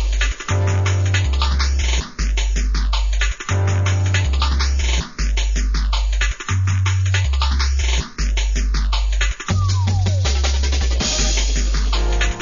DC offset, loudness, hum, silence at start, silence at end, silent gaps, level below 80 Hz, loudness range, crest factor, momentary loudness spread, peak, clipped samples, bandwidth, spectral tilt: 0.6%; -19 LUFS; none; 0 s; 0 s; none; -20 dBFS; 1 LU; 12 dB; 3 LU; -4 dBFS; under 0.1%; 7.4 kHz; -4 dB/octave